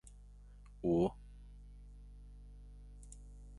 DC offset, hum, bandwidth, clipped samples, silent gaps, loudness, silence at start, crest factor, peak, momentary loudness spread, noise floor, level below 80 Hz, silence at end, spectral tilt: under 0.1%; 50 Hz at -55 dBFS; 11.5 kHz; under 0.1%; none; -36 LUFS; 0.05 s; 22 dB; -20 dBFS; 26 LU; -56 dBFS; -54 dBFS; 0 s; -8.5 dB/octave